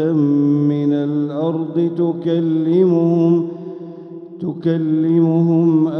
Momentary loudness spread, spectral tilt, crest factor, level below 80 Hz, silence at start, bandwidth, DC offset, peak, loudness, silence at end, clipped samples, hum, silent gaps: 15 LU; -11 dB/octave; 12 dB; -70 dBFS; 0 s; 5.8 kHz; under 0.1%; -4 dBFS; -16 LUFS; 0 s; under 0.1%; none; none